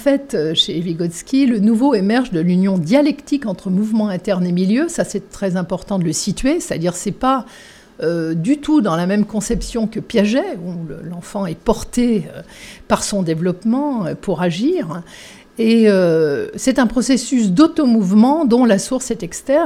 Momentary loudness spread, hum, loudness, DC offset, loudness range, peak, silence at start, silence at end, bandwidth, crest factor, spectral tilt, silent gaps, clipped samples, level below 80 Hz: 11 LU; none; -17 LUFS; under 0.1%; 6 LU; 0 dBFS; 0 s; 0 s; 14.5 kHz; 16 dB; -5.5 dB/octave; none; under 0.1%; -40 dBFS